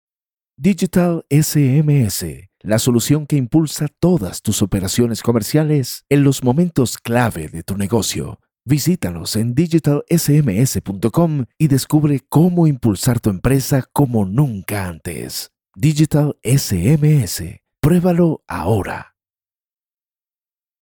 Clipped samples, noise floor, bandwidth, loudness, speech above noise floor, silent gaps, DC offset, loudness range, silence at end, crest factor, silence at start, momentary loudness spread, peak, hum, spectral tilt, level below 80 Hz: under 0.1%; under -90 dBFS; 18 kHz; -17 LUFS; over 74 dB; none; under 0.1%; 3 LU; 1.85 s; 14 dB; 0.6 s; 10 LU; -2 dBFS; none; -6 dB/octave; -42 dBFS